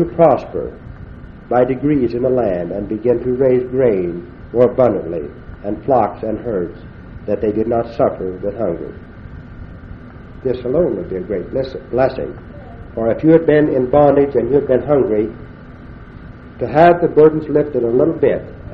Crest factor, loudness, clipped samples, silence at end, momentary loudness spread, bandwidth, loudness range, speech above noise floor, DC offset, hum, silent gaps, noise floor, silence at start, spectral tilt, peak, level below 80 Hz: 16 dB; -16 LUFS; under 0.1%; 0 s; 24 LU; 5.6 kHz; 7 LU; 20 dB; under 0.1%; none; none; -35 dBFS; 0 s; -10.5 dB/octave; 0 dBFS; -38 dBFS